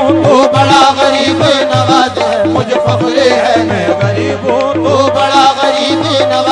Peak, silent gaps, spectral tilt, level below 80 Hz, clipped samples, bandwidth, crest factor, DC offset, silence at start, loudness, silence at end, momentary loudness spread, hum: 0 dBFS; none; -5 dB/octave; -46 dBFS; 0.4%; 10.5 kHz; 10 dB; under 0.1%; 0 s; -9 LUFS; 0 s; 5 LU; none